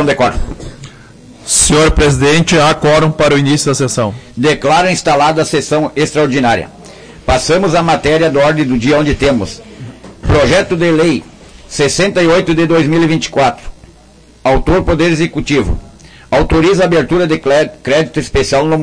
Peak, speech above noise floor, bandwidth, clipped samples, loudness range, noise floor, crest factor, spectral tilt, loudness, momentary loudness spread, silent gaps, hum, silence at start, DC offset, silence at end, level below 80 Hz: 0 dBFS; 31 dB; 10.5 kHz; under 0.1%; 3 LU; -41 dBFS; 12 dB; -4.5 dB/octave; -11 LUFS; 10 LU; none; none; 0 s; under 0.1%; 0 s; -26 dBFS